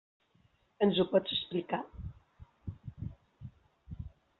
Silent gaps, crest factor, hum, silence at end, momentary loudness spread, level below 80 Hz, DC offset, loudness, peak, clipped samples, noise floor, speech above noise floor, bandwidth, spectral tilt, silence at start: none; 22 dB; none; 0.3 s; 23 LU; -56 dBFS; under 0.1%; -32 LUFS; -14 dBFS; under 0.1%; -70 dBFS; 39 dB; 4.5 kHz; -4.5 dB/octave; 0.8 s